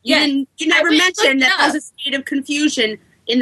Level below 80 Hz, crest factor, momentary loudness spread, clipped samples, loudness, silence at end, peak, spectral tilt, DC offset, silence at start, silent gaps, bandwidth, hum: -66 dBFS; 16 dB; 9 LU; under 0.1%; -15 LUFS; 0 s; 0 dBFS; -1 dB/octave; under 0.1%; 0.05 s; none; 13 kHz; none